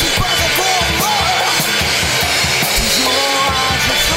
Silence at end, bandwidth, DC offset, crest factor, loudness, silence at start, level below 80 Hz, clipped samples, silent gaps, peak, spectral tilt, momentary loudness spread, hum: 0 s; 16.5 kHz; under 0.1%; 12 dB; -13 LUFS; 0 s; -30 dBFS; under 0.1%; none; -2 dBFS; -1.5 dB/octave; 1 LU; none